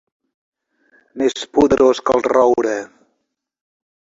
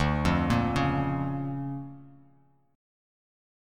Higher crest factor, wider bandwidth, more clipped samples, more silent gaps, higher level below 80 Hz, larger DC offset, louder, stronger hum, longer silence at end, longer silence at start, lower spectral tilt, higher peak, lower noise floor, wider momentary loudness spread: about the same, 16 dB vs 20 dB; second, 8 kHz vs 13 kHz; neither; neither; second, -50 dBFS vs -42 dBFS; neither; first, -16 LUFS vs -28 LUFS; neither; first, 1.3 s vs 1 s; first, 1.15 s vs 0 s; second, -5 dB/octave vs -7 dB/octave; first, -2 dBFS vs -10 dBFS; first, -73 dBFS vs -63 dBFS; second, 8 LU vs 12 LU